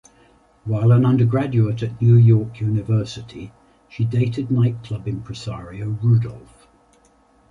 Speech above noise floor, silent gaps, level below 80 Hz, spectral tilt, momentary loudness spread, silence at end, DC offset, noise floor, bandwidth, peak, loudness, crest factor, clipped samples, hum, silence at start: 38 dB; none; -48 dBFS; -9 dB/octave; 17 LU; 1.1 s; under 0.1%; -56 dBFS; 7.4 kHz; -4 dBFS; -19 LUFS; 14 dB; under 0.1%; none; 0.65 s